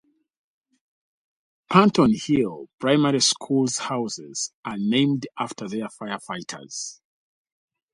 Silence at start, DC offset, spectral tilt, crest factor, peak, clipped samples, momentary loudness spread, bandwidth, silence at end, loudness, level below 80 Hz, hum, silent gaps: 1.7 s; under 0.1%; -4.5 dB/octave; 24 dB; -2 dBFS; under 0.1%; 15 LU; 11.5 kHz; 1 s; -23 LUFS; -60 dBFS; none; 2.74-2.78 s, 4.54-4.63 s